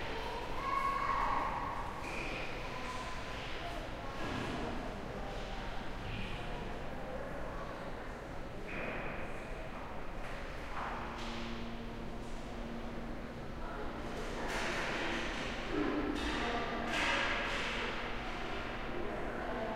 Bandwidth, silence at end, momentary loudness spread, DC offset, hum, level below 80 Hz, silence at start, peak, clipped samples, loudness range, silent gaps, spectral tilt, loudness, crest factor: 15.5 kHz; 0 s; 11 LU; under 0.1%; none; -46 dBFS; 0 s; -20 dBFS; under 0.1%; 8 LU; none; -4.5 dB/octave; -39 LUFS; 18 dB